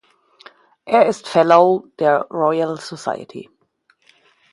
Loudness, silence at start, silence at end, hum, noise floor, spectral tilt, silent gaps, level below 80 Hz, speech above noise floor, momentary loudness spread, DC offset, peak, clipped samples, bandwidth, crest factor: -17 LUFS; 0.85 s; 1.1 s; none; -62 dBFS; -5.5 dB/octave; none; -68 dBFS; 45 dB; 15 LU; under 0.1%; 0 dBFS; under 0.1%; 11.5 kHz; 18 dB